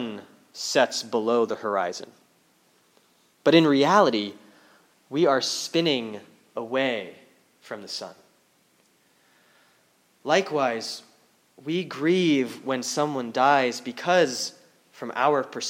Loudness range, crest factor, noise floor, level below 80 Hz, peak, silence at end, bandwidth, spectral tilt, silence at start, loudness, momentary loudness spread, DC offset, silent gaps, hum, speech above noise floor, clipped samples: 10 LU; 22 dB; -64 dBFS; -84 dBFS; -4 dBFS; 0 s; 16.5 kHz; -4 dB/octave; 0 s; -24 LUFS; 19 LU; under 0.1%; none; none; 40 dB; under 0.1%